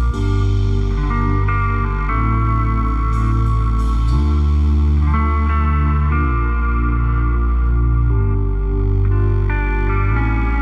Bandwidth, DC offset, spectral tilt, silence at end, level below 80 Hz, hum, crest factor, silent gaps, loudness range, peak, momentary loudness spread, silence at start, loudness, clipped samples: 5.8 kHz; under 0.1%; -9 dB/octave; 0 s; -16 dBFS; none; 10 dB; none; 1 LU; -6 dBFS; 3 LU; 0 s; -18 LUFS; under 0.1%